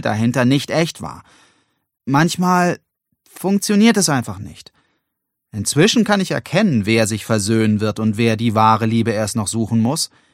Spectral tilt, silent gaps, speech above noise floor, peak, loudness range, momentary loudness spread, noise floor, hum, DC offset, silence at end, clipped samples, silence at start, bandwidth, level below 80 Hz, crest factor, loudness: -5 dB/octave; none; 60 dB; 0 dBFS; 3 LU; 12 LU; -77 dBFS; none; under 0.1%; 0.25 s; under 0.1%; 0 s; 16 kHz; -54 dBFS; 16 dB; -17 LUFS